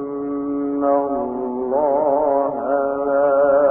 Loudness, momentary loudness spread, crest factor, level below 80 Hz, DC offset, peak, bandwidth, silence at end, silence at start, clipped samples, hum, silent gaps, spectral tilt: -19 LUFS; 9 LU; 12 dB; -54 dBFS; under 0.1%; -6 dBFS; 2.8 kHz; 0 s; 0 s; under 0.1%; none; none; -11.5 dB/octave